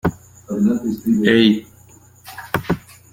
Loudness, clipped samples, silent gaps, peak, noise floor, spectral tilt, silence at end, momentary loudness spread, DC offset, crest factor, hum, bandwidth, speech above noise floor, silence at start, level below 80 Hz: -18 LUFS; under 0.1%; none; -2 dBFS; -47 dBFS; -6 dB/octave; 0.35 s; 14 LU; under 0.1%; 18 dB; none; 17 kHz; 31 dB; 0.05 s; -48 dBFS